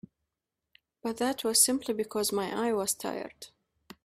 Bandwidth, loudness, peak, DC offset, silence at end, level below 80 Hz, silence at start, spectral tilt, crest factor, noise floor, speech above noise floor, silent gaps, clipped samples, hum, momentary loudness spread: 15.5 kHz; -29 LUFS; -8 dBFS; under 0.1%; 0.6 s; -68 dBFS; 1.05 s; -2 dB/octave; 24 dB; -87 dBFS; 57 dB; none; under 0.1%; none; 18 LU